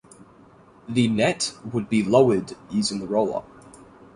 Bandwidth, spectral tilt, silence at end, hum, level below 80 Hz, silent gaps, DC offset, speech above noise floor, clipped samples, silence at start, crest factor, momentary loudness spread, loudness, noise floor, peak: 11.5 kHz; -5 dB/octave; 0.3 s; none; -58 dBFS; none; under 0.1%; 29 dB; under 0.1%; 0.9 s; 20 dB; 10 LU; -23 LUFS; -51 dBFS; -4 dBFS